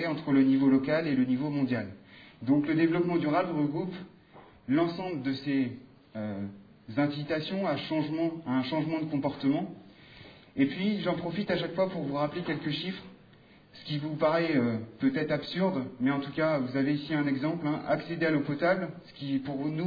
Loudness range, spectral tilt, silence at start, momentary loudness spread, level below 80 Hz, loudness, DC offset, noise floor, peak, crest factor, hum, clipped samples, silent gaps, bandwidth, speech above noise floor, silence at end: 4 LU; -9 dB/octave; 0 s; 12 LU; -68 dBFS; -30 LUFS; under 0.1%; -57 dBFS; -14 dBFS; 16 dB; none; under 0.1%; none; 5 kHz; 28 dB; 0 s